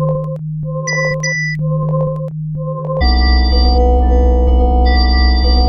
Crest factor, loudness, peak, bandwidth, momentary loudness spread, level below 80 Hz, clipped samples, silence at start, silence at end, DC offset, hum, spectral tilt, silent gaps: 12 dB; -14 LUFS; -2 dBFS; 6.4 kHz; 9 LU; -14 dBFS; under 0.1%; 0 s; 0 s; under 0.1%; none; -6 dB/octave; none